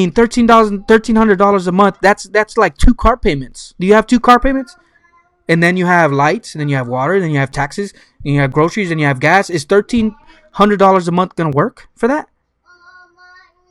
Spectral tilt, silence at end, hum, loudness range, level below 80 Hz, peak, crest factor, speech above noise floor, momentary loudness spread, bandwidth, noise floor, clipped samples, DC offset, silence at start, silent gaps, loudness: -6 dB/octave; 1.5 s; none; 4 LU; -26 dBFS; 0 dBFS; 14 dB; 41 dB; 10 LU; 12.5 kHz; -53 dBFS; 0.4%; under 0.1%; 0 s; none; -13 LUFS